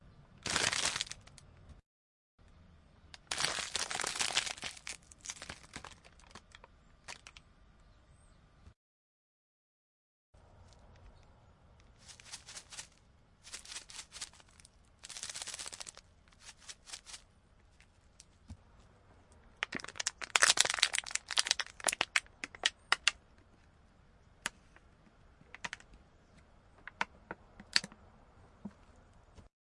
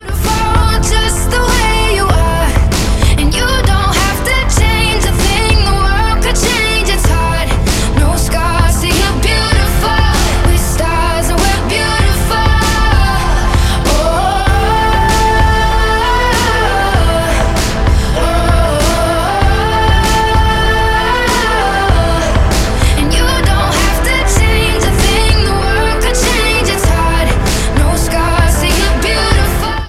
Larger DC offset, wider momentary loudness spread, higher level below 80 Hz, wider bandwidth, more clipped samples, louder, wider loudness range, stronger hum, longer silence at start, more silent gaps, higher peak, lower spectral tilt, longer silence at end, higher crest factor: neither; first, 25 LU vs 2 LU; second, -66 dBFS vs -14 dBFS; second, 11.5 kHz vs 16 kHz; neither; second, -35 LUFS vs -12 LUFS; first, 22 LU vs 1 LU; neither; about the same, 0.05 s vs 0 s; first, 1.86-2.38 s, 8.76-10.33 s vs none; about the same, -2 dBFS vs 0 dBFS; second, 0.5 dB/octave vs -4 dB/octave; first, 0.35 s vs 0 s; first, 40 dB vs 10 dB